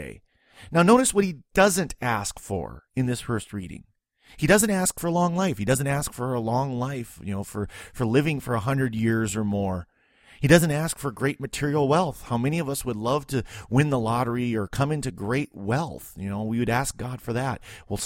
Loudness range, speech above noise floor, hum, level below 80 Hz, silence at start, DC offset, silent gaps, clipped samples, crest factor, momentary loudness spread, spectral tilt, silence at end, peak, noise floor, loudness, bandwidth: 3 LU; 31 dB; none; -48 dBFS; 0 s; under 0.1%; none; under 0.1%; 24 dB; 14 LU; -5.5 dB/octave; 0 s; 0 dBFS; -56 dBFS; -25 LUFS; 16.5 kHz